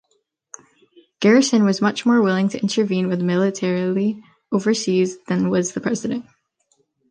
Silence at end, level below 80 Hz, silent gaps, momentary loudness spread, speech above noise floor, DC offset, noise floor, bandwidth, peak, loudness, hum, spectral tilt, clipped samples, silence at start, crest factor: 0.9 s; -66 dBFS; none; 9 LU; 50 dB; under 0.1%; -68 dBFS; 10 kHz; -4 dBFS; -19 LUFS; none; -5.5 dB/octave; under 0.1%; 1.2 s; 16 dB